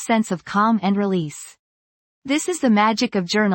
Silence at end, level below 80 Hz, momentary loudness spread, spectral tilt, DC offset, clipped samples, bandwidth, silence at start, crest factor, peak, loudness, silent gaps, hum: 0 s; -62 dBFS; 16 LU; -5 dB/octave; under 0.1%; under 0.1%; 17 kHz; 0 s; 16 dB; -4 dBFS; -20 LUFS; 1.59-2.22 s; none